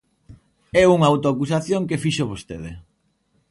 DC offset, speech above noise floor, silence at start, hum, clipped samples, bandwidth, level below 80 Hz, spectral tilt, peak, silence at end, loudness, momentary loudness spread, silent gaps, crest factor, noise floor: under 0.1%; 47 dB; 0.3 s; none; under 0.1%; 11.5 kHz; -48 dBFS; -6 dB/octave; -2 dBFS; 0.7 s; -19 LUFS; 19 LU; none; 18 dB; -66 dBFS